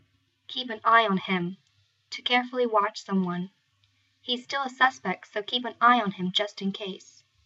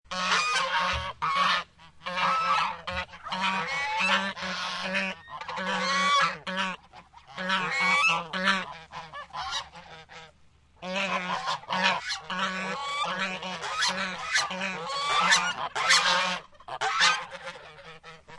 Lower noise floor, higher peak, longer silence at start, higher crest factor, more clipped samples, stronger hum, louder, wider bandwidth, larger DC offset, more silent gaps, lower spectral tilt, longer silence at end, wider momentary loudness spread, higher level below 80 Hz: first, -68 dBFS vs -59 dBFS; about the same, -6 dBFS vs -6 dBFS; first, 0.5 s vs 0.1 s; about the same, 22 dB vs 22 dB; neither; neither; about the same, -26 LUFS vs -26 LUFS; second, 7.8 kHz vs 11.5 kHz; neither; neither; first, -5 dB/octave vs -1.5 dB/octave; first, 0.5 s vs 0 s; second, 15 LU vs 19 LU; second, -82 dBFS vs -58 dBFS